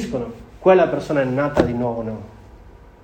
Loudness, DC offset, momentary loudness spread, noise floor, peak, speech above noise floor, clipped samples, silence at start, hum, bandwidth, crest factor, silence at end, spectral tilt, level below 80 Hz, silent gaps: -19 LUFS; under 0.1%; 15 LU; -44 dBFS; 0 dBFS; 25 dB; under 0.1%; 0 s; none; 9.4 kHz; 20 dB; 0.35 s; -7.5 dB/octave; -42 dBFS; none